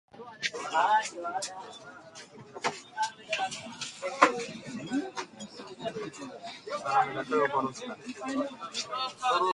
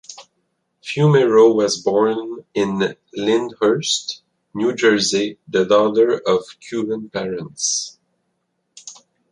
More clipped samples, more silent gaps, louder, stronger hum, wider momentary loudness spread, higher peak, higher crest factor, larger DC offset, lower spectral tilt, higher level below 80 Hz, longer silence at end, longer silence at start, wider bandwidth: neither; neither; second, -31 LUFS vs -18 LUFS; neither; about the same, 18 LU vs 19 LU; about the same, -4 dBFS vs -2 dBFS; first, 28 dB vs 16 dB; neither; second, -3 dB/octave vs -4.5 dB/octave; second, -76 dBFS vs -62 dBFS; second, 0 s vs 0.4 s; about the same, 0.15 s vs 0.1 s; about the same, 11.5 kHz vs 11 kHz